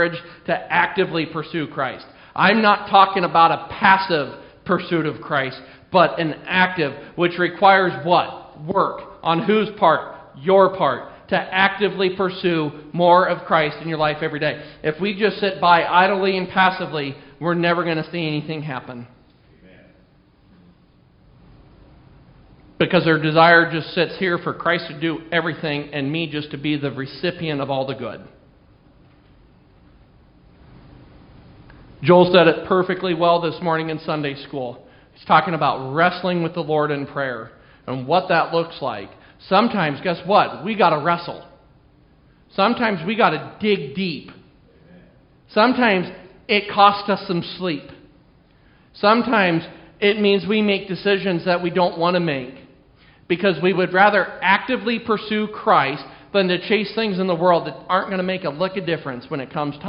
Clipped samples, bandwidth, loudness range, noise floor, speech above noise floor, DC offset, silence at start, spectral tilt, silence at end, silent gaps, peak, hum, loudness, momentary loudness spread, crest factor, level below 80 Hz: under 0.1%; 5.4 kHz; 6 LU; -54 dBFS; 35 dB; under 0.1%; 0 s; -3.5 dB/octave; 0 s; none; 0 dBFS; none; -19 LUFS; 13 LU; 20 dB; -56 dBFS